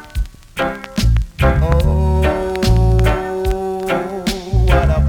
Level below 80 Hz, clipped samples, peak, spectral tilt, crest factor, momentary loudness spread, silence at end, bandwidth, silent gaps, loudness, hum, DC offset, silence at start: -18 dBFS; under 0.1%; -2 dBFS; -6.5 dB/octave; 12 dB; 8 LU; 0 s; 16.5 kHz; none; -17 LUFS; none; under 0.1%; 0 s